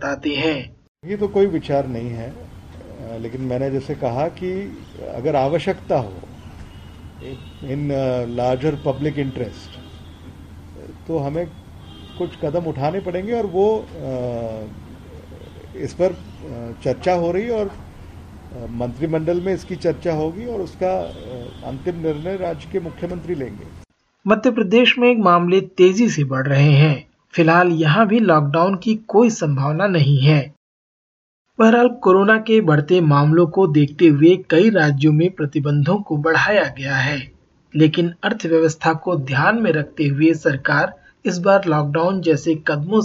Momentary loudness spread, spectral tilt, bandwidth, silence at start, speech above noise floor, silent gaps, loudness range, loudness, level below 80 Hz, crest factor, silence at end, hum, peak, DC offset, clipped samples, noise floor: 18 LU; -7 dB/octave; 7.8 kHz; 0 s; 21 dB; 0.88-0.95 s, 30.57-31.45 s; 11 LU; -18 LUFS; -46 dBFS; 16 dB; 0 s; none; -2 dBFS; under 0.1%; under 0.1%; -39 dBFS